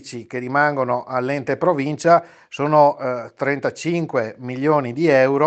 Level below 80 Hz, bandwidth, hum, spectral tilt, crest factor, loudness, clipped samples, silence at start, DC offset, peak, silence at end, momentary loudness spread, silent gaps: -68 dBFS; 8.8 kHz; none; -6.5 dB/octave; 18 dB; -19 LUFS; under 0.1%; 0.05 s; under 0.1%; 0 dBFS; 0 s; 10 LU; none